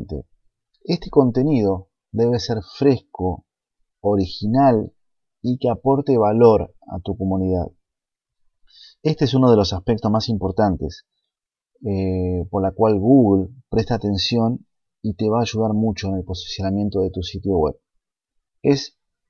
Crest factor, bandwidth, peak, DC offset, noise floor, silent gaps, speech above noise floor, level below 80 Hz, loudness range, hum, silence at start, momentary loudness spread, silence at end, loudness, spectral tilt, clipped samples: 20 dB; 7 kHz; 0 dBFS; under 0.1%; -84 dBFS; none; 66 dB; -44 dBFS; 4 LU; none; 0 s; 14 LU; 0.4 s; -20 LUFS; -7.5 dB/octave; under 0.1%